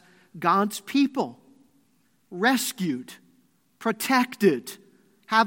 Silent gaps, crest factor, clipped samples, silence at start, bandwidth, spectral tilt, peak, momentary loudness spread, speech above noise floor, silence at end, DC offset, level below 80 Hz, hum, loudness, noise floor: none; 20 dB; under 0.1%; 0.35 s; 17 kHz; -4 dB/octave; -8 dBFS; 15 LU; 42 dB; 0 s; under 0.1%; -80 dBFS; none; -25 LUFS; -67 dBFS